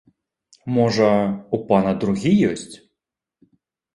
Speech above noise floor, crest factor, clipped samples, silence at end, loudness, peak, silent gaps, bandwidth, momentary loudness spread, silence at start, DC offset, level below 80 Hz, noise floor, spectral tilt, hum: 64 dB; 20 dB; under 0.1%; 1.2 s; -19 LUFS; -2 dBFS; none; 11.5 kHz; 13 LU; 0.65 s; under 0.1%; -54 dBFS; -83 dBFS; -7 dB/octave; none